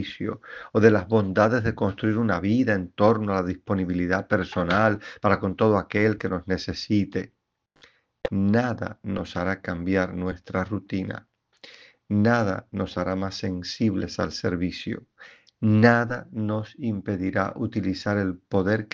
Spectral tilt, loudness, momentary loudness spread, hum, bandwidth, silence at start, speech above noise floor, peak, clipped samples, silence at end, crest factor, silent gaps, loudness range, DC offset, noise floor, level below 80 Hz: -7.5 dB/octave; -25 LUFS; 10 LU; none; 7.2 kHz; 0 s; 35 dB; -2 dBFS; under 0.1%; 0.1 s; 22 dB; none; 5 LU; under 0.1%; -59 dBFS; -56 dBFS